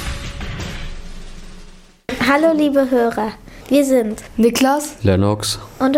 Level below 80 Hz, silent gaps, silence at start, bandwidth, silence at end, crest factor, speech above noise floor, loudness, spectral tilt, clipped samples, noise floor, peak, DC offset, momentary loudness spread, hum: -34 dBFS; none; 0 s; 16.5 kHz; 0 s; 14 dB; 24 dB; -17 LUFS; -5 dB/octave; under 0.1%; -40 dBFS; -2 dBFS; under 0.1%; 20 LU; none